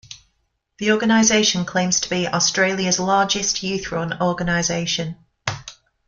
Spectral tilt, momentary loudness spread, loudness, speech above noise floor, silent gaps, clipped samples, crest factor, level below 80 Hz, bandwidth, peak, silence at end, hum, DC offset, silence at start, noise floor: -3 dB/octave; 13 LU; -19 LUFS; 50 dB; none; under 0.1%; 20 dB; -50 dBFS; 10 kHz; -2 dBFS; 0.35 s; none; under 0.1%; 0.1 s; -70 dBFS